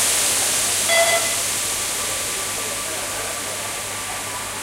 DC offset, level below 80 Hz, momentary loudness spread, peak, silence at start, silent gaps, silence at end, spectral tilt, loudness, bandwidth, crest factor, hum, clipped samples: under 0.1%; -50 dBFS; 10 LU; -4 dBFS; 0 s; none; 0 s; 0 dB/octave; -20 LUFS; 16 kHz; 18 dB; none; under 0.1%